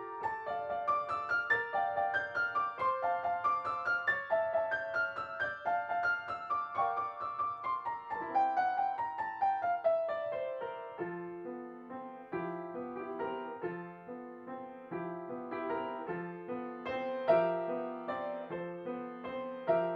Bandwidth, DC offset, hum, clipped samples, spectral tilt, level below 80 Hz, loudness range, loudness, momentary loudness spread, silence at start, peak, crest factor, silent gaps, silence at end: 7.2 kHz; under 0.1%; none; under 0.1%; -6.5 dB/octave; -74 dBFS; 9 LU; -35 LUFS; 11 LU; 0 s; -16 dBFS; 18 dB; none; 0 s